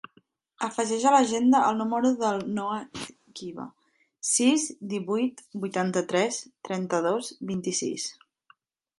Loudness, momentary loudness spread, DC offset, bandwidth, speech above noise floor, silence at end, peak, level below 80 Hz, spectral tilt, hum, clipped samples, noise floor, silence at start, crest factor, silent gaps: -26 LUFS; 17 LU; under 0.1%; 11.5 kHz; 38 dB; 0.85 s; -8 dBFS; -72 dBFS; -4 dB/octave; none; under 0.1%; -64 dBFS; 0.6 s; 20 dB; none